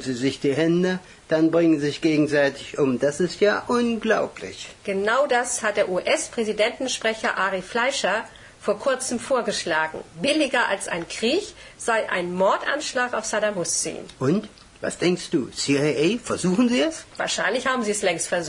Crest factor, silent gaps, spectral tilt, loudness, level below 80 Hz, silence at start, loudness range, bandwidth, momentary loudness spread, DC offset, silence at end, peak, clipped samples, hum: 16 dB; none; -4 dB/octave; -23 LUFS; -58 dBFS; 0 s; 2 LU; 11 kHz; 8 LU; under 0.1%; 0 s; -8 dBFS; under 0.1%; none